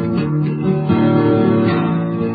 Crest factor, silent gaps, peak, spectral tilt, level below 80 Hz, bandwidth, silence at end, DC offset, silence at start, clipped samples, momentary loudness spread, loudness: 12 dB; none; -4 dBFS; -13.5 dB/octave; -44 dBFS; 4.9 kHz; 0 s; under 0.1%; 0 s; under 0.1%; 5 LU; -16 LUFS